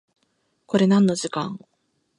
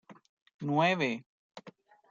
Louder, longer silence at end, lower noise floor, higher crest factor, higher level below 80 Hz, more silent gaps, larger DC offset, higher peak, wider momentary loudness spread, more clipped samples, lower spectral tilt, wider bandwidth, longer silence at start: first, -21 LUFS vs -30 LUFS; first, 0.6 s vs 0.4 s; first, -70 dBFS vs -57 dBFS; about the same, 18 dB vs 18 dB; first, -68 dBFS vs -82 dBFS; second, none vs 0.29-0.46 s, 0.54-0.59 s, 1.26-1.50 s; neither; first, -6 dBFS vs -16 dBFS; second, 15 LU vs 24 LU; neither; about the same, -6 dB/octave vs -6 dB/octave; first, 11 kHz vs 7.6 kHz; first, 0.7 s vs 0.1 s